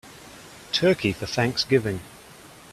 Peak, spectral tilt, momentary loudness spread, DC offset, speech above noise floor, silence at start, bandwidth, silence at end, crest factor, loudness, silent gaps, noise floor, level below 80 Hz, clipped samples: -6 dBFS; -5 dB/octave; 22 LU; under 0.1%; 24 dB; 0.05 s; 14.5 kHz; 0 s; 20 dB; -24 LUFS; none; -47 dBFS; -54 dBFS; under 0.1%